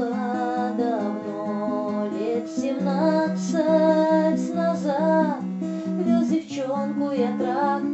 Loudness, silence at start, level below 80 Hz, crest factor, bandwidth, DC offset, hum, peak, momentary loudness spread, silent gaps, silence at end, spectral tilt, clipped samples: -23 LUFS; 0 s; -82 dBFS; 16 dB; 8.2 kHz; under 0.1%; none; -8 dBFS; 8 LU; none; 0 s; -7 dB/octave; under 0.1%